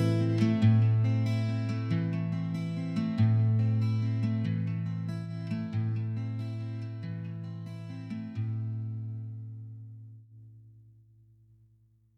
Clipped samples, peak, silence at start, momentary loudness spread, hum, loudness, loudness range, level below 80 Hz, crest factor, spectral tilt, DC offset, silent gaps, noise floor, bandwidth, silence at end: under 0.1%; -14 dBFS; 0 s; 16 LU; none; -31 LUFS; 12 LU; -68 dBFS; 16 dB; -9 dB/octave; under 0.1%; none; -64 dBFS; 6.4 kHz; 1.35 s